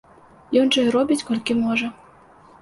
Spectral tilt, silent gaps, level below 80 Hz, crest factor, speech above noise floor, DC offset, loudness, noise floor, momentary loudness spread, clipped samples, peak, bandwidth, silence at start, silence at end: -4 dB/octave; none; -60 dBFS; 16 dB; 30 dB; under 0.1%; -20 LUFS; -49 dBFS; 6 LU; under 0.1%; -6 dBFS; 11.5 kHz; 0.5 s; 0.7 s